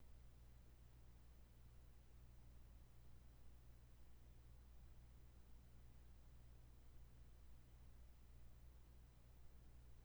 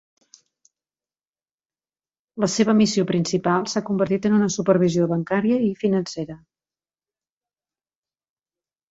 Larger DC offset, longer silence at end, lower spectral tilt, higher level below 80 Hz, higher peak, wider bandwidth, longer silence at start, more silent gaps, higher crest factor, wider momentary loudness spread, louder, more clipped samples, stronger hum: neither; second, 0 s vs 2.55 s; about the same, -5.5 dB/octave vs -5.5 dB/octave; about the same, -66 dBFS vs -62 dBFS; second, -50 dBFS vs -4 dBFS; first, over 20 kHz vs 8 kHz; second, 0 s vs 2.35 s; neither; second, 12 dB vs 20 dB; second, 1 LU vs 7 LU; second, -68 LUFS vs -21 LUFS; neither; neither